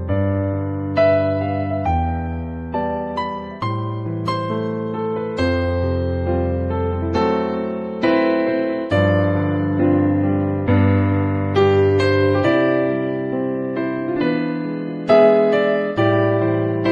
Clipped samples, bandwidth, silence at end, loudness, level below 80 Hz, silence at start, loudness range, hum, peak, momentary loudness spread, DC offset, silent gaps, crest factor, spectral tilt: under 0.1%; 7.2 kHz; 0 s; -19 LUFS; -38 dBFS; 0 s; 6 LU; none; -2 dBFS; 8 LU; under 0.1%; none; 16 dB; -8.5 dB/octave